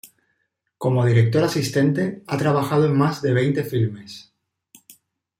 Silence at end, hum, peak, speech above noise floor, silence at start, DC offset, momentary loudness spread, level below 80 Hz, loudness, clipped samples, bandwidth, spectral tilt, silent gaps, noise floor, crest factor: 1.2 s; none; -4 dBFS; 53 dB; 0.05 s; under 0.1%; 9 LU; -60 dBFS; -20 LUFS; under 0.1%; 16 kHz; -7 dB/octave; none; -73 dBFS; 16 dB